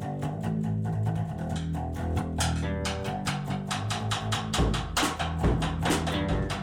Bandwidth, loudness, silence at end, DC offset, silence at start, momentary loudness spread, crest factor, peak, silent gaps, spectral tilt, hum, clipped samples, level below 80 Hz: 17 kHz; -29 LUFS; 0 s; under 0.1%; 0 s; 5 LU; 16 dB; -14 dBFS; none; -5 dB/octave; none; under 0.1%; -38 dBFS